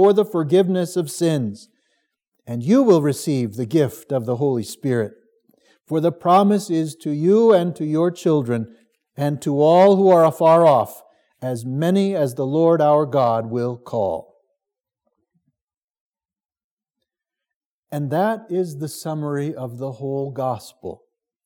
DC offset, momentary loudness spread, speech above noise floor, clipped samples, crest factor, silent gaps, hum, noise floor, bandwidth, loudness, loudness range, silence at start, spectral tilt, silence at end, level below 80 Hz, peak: under 0.1%; 15 LU; over 72 dB; under 0.1%; 18 dB; 2.28-2.32 s, 15.62-15.67 s, 15.83-15.88 s, 16.00-16.13 s, 16.64-16.77 s, 17.56-17.83 s; none; under -90 dBFS; 18.5 kHz; -19 LUFS; 11 LU; 0 s; -7 dB/octave; 0.5 s; -74 dBFS; -2 dBFS